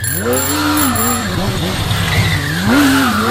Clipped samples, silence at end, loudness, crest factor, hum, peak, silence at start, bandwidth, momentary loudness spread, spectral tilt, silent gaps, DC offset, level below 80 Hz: under 0.1%; 0 s; -14 LUFS; 12 dB; none; -2 dBFS; 0 s; 16.5 kHz; 6 LU; -4 dB/octave; none; under 0.1%; -32 dBFS